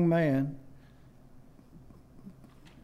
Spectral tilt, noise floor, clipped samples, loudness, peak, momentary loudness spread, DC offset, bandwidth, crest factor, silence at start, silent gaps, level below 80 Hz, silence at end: -9.5 dB/octave; -55 dBFS; under 0.1%; -29 LUFS; -16 dBFS; 29 LU; under 0.1%; 12.5 kHz; 16 dB; 0 s; none; -58 dBFS; 0.35 s